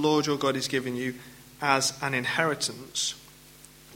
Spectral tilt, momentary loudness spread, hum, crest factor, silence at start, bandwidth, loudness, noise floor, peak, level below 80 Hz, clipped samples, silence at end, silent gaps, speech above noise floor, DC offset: -3 dB/octave; 10 LU; none; 24 dB; 0 s; 17 kHz; -27 LUFS; -52 dBFS; -6 dBFS; -64 dBFS; under 0.1%; 0 s; none; 24 dB; under 0.1%